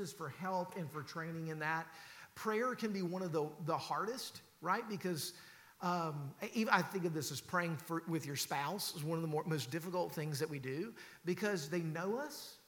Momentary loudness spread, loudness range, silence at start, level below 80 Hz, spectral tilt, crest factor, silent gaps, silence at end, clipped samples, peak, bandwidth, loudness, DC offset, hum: 8 LU; 3 LU; 0 s; -84 dBFS; -4.5 dB/octave; 24 dB; none; 0.1 s; under 0.1%; -16 dBFS; 17.5 kHz; -40 LUFS; under 0.1%; none